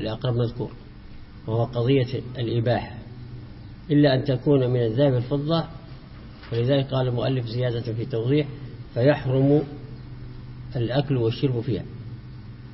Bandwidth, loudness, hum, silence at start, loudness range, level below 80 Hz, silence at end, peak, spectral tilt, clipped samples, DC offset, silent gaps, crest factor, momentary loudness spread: 5.8 kHz; -24 LUFS; none; 0 s; 3 LU; -46 dBFS; 0 s; -6 dBFS; -11.5 dB/octave; under 0.1%; under 0.1%; none; 18 dB; 19 LU